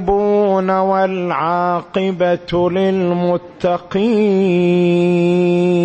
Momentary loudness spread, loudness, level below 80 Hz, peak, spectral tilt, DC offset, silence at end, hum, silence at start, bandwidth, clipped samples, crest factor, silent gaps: 5 LU; -15 LUFS; -44 dBFS; -4 dBFS; -8 dB/octave; under 0.1%; 0 s; none; 0 s; 8.4 kHz; under 0.1%; 10 dB; none